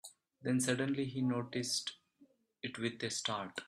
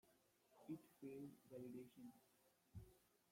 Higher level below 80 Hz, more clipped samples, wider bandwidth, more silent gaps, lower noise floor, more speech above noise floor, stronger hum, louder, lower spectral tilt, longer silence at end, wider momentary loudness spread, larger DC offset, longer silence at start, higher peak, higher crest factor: about the same, -76 dBFS vs -80 dBFS; neither; second, 14 kHz vs 16.5 kHz; neither; second, -69 dBFS vs -79 dBFS; first, 32 dB vs 20 dB; neither; first, -37 LUFS vs -60 LUFS; second, -4 dB/octave vs -7 dB/octave; second, 0 s vs 0.15 s; first, 12 LU vs 8 LU; neither; about the same, 0.05 s vs 0.05 s; first, -18 dBFS vs -42 dBFS; about the same, 20 dB vs 18 dB